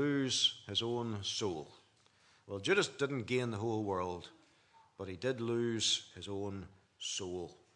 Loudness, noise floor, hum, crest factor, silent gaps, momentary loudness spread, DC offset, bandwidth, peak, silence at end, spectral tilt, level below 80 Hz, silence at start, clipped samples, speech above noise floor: -36 LUFS; -68 dBFS; none; 20 dB; none; 15 LU; under 0.1%; 11 kHz; -18 dBFS; 0.2 s; -3.5 dB/octave; -78 dBFS; 0 s; under 0.1%; 32 dB